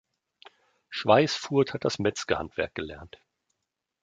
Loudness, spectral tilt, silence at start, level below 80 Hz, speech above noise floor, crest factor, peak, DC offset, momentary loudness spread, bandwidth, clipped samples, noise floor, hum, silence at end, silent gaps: -27 LUFS; -5 dB/octave; 0.9 s; -56 dBFS; 57 dB; 22 dB; -6 dBFS; under 0.1%; 16 LU; 9.2 kHz; under 0.1%; -84 dBFS; none; 0.95 s; none